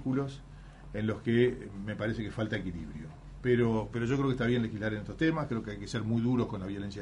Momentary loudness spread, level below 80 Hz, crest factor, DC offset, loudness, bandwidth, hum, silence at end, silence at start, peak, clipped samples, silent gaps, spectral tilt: 14 LU; -50 dBFS; 18 dB; under 0.1%; -32 LUFS; 10.5 kHz; none; 0 s; 0 s; -14 dBFS; under 0.1%; none; -7.5 dB/octave